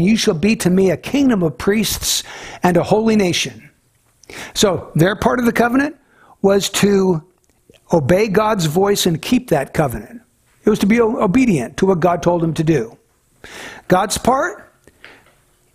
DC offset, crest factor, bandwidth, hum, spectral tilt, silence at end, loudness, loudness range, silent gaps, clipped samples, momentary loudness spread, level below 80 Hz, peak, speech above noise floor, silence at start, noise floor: under 0.1%; 16 dB; 16 kHz; none; -5 dB/octave; 1.1 s; -16 LUFS; 2 LU; none; under 0.1%; 9 LU; -42 dBFS; -2 dBFS; 43 dB; 0 s; -58 dBFS